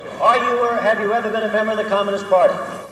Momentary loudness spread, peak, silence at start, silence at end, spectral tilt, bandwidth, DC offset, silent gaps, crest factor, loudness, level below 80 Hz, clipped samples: 4 LU; -2 dBFS; 0 s; 0 s; -4.5 dB/octave; 13 kHz; under 0.1%; none; 16 dB; -18 LUFS; -62 dBFS; under 0.1%